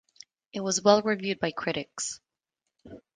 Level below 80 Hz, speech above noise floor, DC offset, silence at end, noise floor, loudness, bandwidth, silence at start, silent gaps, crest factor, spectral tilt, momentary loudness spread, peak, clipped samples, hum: -68 dBFS; 58 dB; under 0.1%; 0.15 s; -85 dBFS; -27 LUFS; 10 kHz; 0.55 s; none; 24 dB; -3.5 dB/octave; 13 LU; -6 dBFS; under 0.1%; none